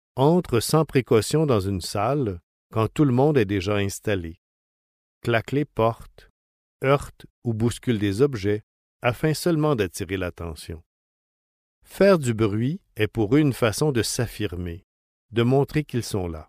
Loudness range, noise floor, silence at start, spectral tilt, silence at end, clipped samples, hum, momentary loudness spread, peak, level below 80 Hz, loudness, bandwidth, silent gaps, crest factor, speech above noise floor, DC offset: 5 LU; under -90 dBFS; 0.15 s; -6 dB/octave; 0.05 s; under 0.1%; none; 12 LU; -6 dBFS; -48 dBFS; -23 LUFS; 15.5 kHz; 2.43-2.70 s, 4.38-5.21 s, 6.30-6.79 s, 7.30-7.42 s, 8.63-9.00 s, 10.86-11.82 s, 14.84-15.29 s; 18 dB; over 67 dB; under 0.1%